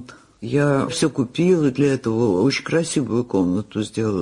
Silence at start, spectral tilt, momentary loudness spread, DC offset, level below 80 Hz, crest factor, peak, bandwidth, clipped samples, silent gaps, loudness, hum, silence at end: 0 s; -6 dB/octave; 6 LU; under 0.1%; -54 dBFS; 14 dB; -6 dBFS; 11 kHz; under 0.1%; none; -20 LUFS; none; 0 s